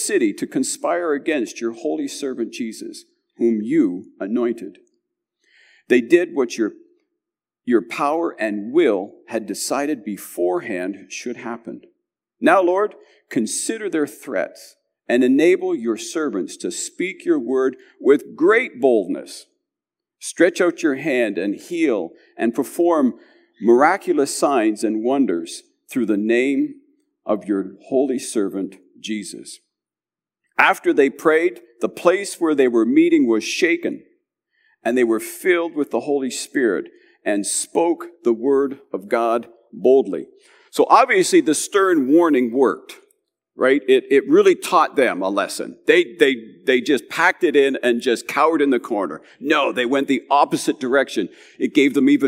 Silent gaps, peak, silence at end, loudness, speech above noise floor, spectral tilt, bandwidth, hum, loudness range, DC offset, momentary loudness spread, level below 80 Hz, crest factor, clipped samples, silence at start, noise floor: none; 0 dBFS; 0 s; -19 LUFS; over 71 dB; -4 dB/octave; 16 kHz; none; 6 LU; under 0.1%; 13 LU; -84 dBFS; 20 dB; under 0.1%; 0 s; under -90 dBFS